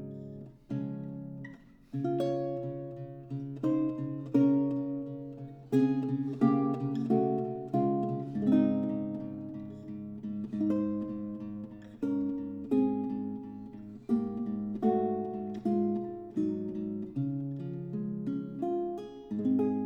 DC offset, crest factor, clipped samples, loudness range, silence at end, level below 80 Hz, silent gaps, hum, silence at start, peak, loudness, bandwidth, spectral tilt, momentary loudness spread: under 0.1%; 18 dB; under 0.1%; 6 LU; 0 s; -66 dBFS; none; none; 0 s; -14 dBFS; -32 LUFS; 6 kHz; -10 dB/octave; 15 LU